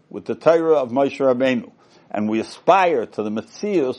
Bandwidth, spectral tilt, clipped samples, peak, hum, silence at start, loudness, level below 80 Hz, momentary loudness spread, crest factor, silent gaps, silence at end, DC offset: 10.5 kHz; -6 dB/octave; under 0.1%; -2 dBFS; none; 0.15 s; -19 LUFS; -70 dBFS; 11 LU; 18 dB; none; 0 s; under 0.1%